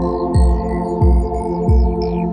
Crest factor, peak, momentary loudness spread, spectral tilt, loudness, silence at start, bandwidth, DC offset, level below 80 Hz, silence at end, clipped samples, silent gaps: 12 dB; -2 dBFS; 4 LU; -9 dB/octave; -17 LUFS; 0 s; 9.6 kHz; under 0.1%; -18 dBFS; 0 s; under 0.1%; none